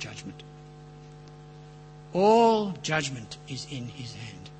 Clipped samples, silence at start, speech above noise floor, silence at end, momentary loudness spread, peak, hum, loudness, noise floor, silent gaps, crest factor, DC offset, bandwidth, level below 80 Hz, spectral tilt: under 0.1%; 0 s; 21 dB; 0 s; 27 LU; -10 dBFS; 50 Hz at -50 dBFS; -26 LUFS; -47 dBFS; none; 20 dB; under 0.1%; 8.8 kHz; -58 dBFS; -5 dB/octave